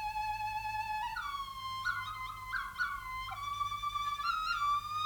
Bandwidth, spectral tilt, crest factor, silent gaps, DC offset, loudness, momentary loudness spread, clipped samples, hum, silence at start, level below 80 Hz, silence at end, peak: 19 kHz; -1 dB/octave; 16 dB; none; under 0.1%; -37 LUFS; 7 LU; under 0.1%; 60 Hz at -65 dBFS; 0 s; -56 dBFS; 0 s; -22 dBFS